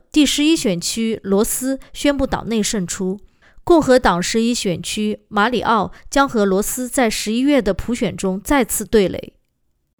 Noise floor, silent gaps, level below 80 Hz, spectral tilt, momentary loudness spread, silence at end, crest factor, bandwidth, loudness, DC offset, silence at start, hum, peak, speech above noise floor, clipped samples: -66 dBFS; none; -38 dBFS; -4 dB/octave; 8 LU; 0.75 s; 16 dB; over 20 kHz; -18 LUFS; under 0.1%; 0.15 s; none; -2 dBFS; 48 dB; under 0.1%